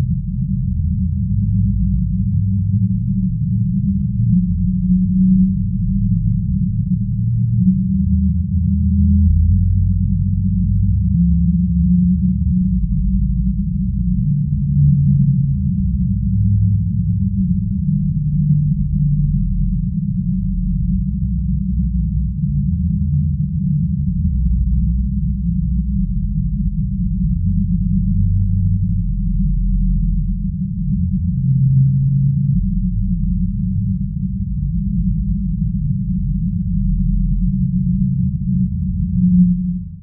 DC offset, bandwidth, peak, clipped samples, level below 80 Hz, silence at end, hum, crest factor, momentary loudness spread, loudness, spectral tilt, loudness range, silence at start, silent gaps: under 0.1%; 0.3 kHz; -4 dBFS; under 0.1%; -22 dBFS; 0 s; none; 12 dB; 6 LU; -18 LUFS; -17.5 dB/octave; 3 LU; 0 s; none